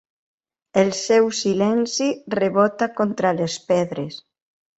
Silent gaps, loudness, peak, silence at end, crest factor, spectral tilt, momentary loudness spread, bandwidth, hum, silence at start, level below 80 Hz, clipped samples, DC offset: none; -20 LUFS; -4 dBFS; 0.6 s; 18 dB; -4.5 dB/octave; 8 LU; 8.2 kHz; none; 0.75 s; -64 dBFS; under 0.1%; under 0.1%